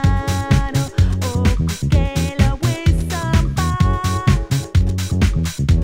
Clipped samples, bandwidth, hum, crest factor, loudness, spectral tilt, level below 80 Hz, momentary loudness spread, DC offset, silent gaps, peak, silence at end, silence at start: under 0.1%; 16.5 kHz; none; 16 dB; -18 LUFS; -6 dB/octave; -22 dBFS; 3 LU; under 0.1%; none; 0 dBFS; 0 s; 0 s